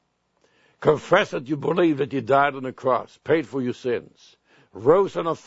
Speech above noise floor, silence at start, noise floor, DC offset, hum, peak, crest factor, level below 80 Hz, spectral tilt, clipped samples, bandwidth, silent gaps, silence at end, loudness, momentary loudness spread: 45 dB; 0.8 s; -67 dBFS; under 0.1%; none; -2 dBFS; 22 dB; -62 dBFS; -6.5 dB/octave; under 0.1%; 8 kHz; none; 0.1 s; -22 LUFS; 9 LU